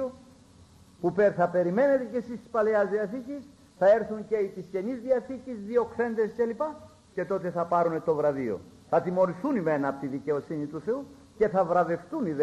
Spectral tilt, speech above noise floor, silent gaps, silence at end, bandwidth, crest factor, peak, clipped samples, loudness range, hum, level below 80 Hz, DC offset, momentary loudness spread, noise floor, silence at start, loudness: -8 dB/octave; 28 dB; none; 0 s; 12 kHz; 16 dB; -12 dBFS; under 0.1%; 3 LU; none; -64 dBFS; under 0.1%; 11 LU; -55 dBFS; 0 s; -28 LUFS